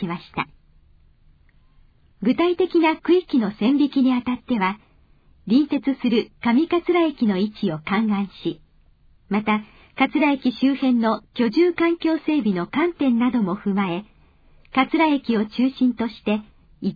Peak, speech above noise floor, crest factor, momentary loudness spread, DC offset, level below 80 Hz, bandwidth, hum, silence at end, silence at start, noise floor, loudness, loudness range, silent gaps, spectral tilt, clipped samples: -6 dBFS; 34 dB; 16 dB; 8 LU; under 0.1%; -56 dBFS; 5 kHz; none; 0 s; 0 s; -55 dBFS; -21 LUFS; 3 LU; none; -8.5 dB/octave; under 0.1%